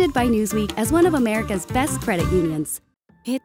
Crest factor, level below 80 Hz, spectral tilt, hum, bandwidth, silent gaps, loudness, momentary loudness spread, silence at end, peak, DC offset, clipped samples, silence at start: 14 dB; -38 dBFS; -5 dB/octave; none; 16.5 kHz; none; -21 LUFS; 11 LU; 0.05 s; -6 dBFS; under 0.1%; under 0.1%; 0 s